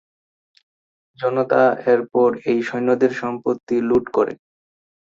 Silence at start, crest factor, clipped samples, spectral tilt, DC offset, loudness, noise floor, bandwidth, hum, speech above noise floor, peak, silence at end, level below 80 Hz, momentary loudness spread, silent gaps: 1.2 s; 18 dB; under 0.1%; -7 dB/octave; under 0.1%; -19 LUFS; under -90 dBFS; 7.4 kHz; none; over 72 dB; -2 dBFS; 0.7 s; -60 dBFS; 8 LU; 3.63-3.67 s